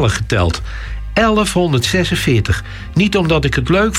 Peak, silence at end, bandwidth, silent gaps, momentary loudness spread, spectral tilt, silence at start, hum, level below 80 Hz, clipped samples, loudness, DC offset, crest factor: -4 dBFS; 0 s; 16.5 kHz; none; 8 LU; -5 dB/octave; 0 s; none; -28 dBFS; under 0.1%; -15 LUFS; under 0.1%; 12 dB